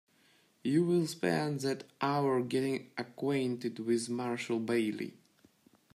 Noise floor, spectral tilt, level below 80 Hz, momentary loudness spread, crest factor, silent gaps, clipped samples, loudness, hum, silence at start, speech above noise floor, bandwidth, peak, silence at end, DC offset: -68 dBFS; -6 dB/octave; -78 dBFS; 7 LU; 16 dB; none; under 0.1%; -33 LUFS; none; 0.65 s; 35 dB; 13.5 kHz; -18 dBFS; 0.85 s; under 0.1%